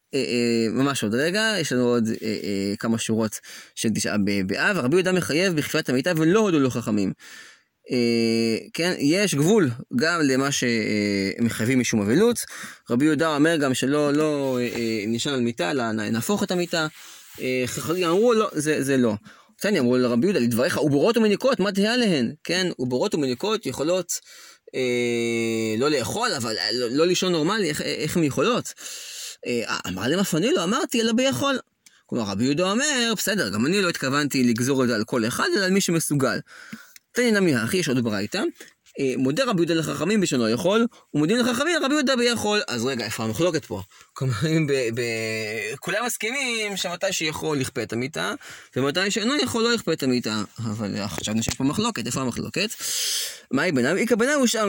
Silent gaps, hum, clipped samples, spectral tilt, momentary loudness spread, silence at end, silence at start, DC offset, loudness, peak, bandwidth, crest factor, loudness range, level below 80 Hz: none; none; under 0.1%; -4.5 dB/octave; 8 LU; 0 s; 0.15 s; under 0.1%; -23 LUFS; -6 dBFS; 17 kHz; 16 dB; 3 LU; -60 dBFS